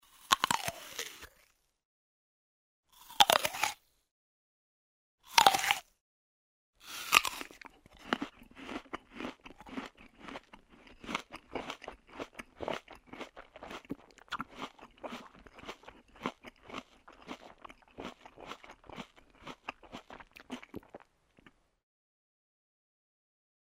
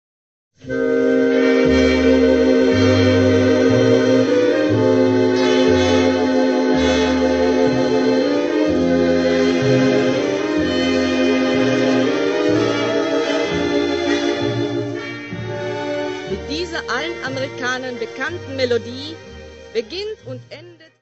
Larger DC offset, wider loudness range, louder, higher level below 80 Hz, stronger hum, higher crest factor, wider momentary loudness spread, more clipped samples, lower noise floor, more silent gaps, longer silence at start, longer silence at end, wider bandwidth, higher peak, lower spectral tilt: neither; first, 19 LU vs 9 LU; second, -33 LUFS vs -17 LUFS; second, -66 dBFS vs -42 dBFS; neither; first, 36 dB vs 14 dB; first, 25 LU vs 12 LU; neither; first, -70 dBFS vs -37 dBFS; first, 1.85-2.83 s, 4.11-5.18 s, 6.01-6.73 s vs none; second, 0.3 s vs 0.65 s; first, 2.8 s vs 0.3 s; first, 16 kHz vs 8 kHz; about the same, -2 dBFS vs -2 dBFS; second, -1 dB/octave vs -5.5 dB/octave